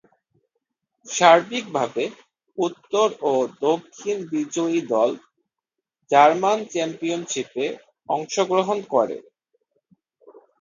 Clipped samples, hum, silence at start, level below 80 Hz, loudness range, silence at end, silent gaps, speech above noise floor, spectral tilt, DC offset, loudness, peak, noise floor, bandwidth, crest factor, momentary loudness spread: under 0.1%; none; 1.05 s; -76 dBFS; 4 LU; 1.4 s; none; 64 dB; -3.5 dB/octave; under 0.1%; -22 LUFS; 0 dBFS; -85 dBFS; 9.6 kHz; 22 dB; 13 LU